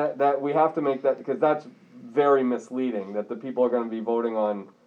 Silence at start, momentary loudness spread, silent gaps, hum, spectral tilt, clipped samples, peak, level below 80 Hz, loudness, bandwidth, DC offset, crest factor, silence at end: 0 s; 8 LU; none; none; -7.5 dB/octave; under 0.1%; -8 dBFS; under -90 dBFS; -25 LUFS; 7.8 kHz; under 0.1%; 16 dB; 0.2 s